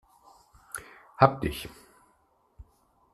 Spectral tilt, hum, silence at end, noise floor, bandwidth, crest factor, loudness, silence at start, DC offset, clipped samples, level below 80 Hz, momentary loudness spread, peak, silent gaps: -6 dB/octave; none; 0.5 s; -68 dBFS; 14 kHz; 30 dB; -26 LUFS; 0.75 s; under 0.1%; under 0.1%; -52 dBFS; 21 LU; -2 dBFS; none